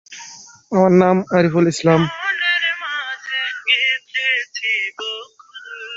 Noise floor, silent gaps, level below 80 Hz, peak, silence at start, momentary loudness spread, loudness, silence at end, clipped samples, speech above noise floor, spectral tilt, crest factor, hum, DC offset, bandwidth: -39 dBFS; none; -58 dBFS; -2 dBFS; 0.1 s; 19 LU; -17 LUFS; 0 s; under 0.1%; 23 dB; -5 dB/octave; 18 dB; none; under 0.1%; 8 kHz